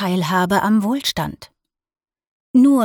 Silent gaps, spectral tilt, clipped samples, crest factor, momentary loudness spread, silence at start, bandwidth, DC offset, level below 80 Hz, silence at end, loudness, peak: 2.27-2.54 s; -5.5 dB/octave; under 0.1%; 14 dB; 9 LU; 0 s; 19.5 kHz; under 0.1%; -52 dBFS; 0 s; -18 LUFS; -4 dBFS